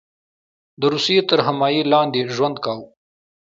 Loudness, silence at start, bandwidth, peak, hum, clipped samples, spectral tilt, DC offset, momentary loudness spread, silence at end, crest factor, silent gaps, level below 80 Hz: -18 LUFS; 0.8 s; 7.8 kHz; -2 dBFS; none; under 0.1%; -5 dB/octave; under 0.1%; 10 LU; 0.75 s; 20 dB; none; -68 dBFS